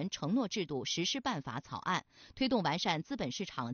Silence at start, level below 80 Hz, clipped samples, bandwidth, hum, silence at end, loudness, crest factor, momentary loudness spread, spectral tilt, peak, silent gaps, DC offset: 0 s; -66 dBFS; under 0.1%; 7 kHz; none; 0 s; -35 LUFS; 18 dB; 7 LU; -3.5 dB/octave; -18 dBFS; none; under 0.1%